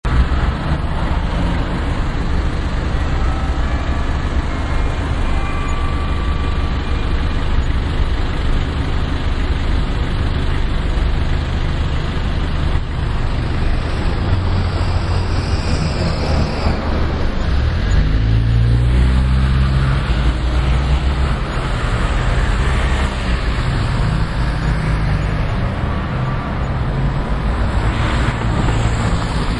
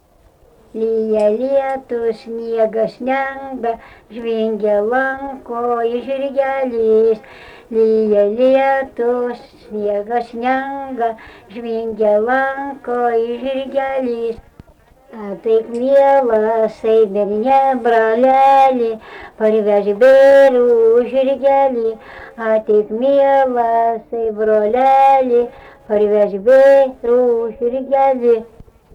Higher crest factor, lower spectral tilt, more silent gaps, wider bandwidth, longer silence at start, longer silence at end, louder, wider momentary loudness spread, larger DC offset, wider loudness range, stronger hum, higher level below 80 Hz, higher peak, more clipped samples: about the same, 14 dB vs 10 dB; about the same, -6.5 dB/octave vs -6.5 dB/octave; neither; first, 11 kHz vs 8.2 kHz; second, 0.05 s vs 0.75 s; second, 0 s vs 0.5 s; second, -19 LUFS vs -15 LUFS; second, 5 LU vs 13 LU; neither; second, 4 LU vs 7 LU; neither; first, -18 dBFS vs -52 dBFS; about the same, -2 dBFS vs -4 dBFS; neither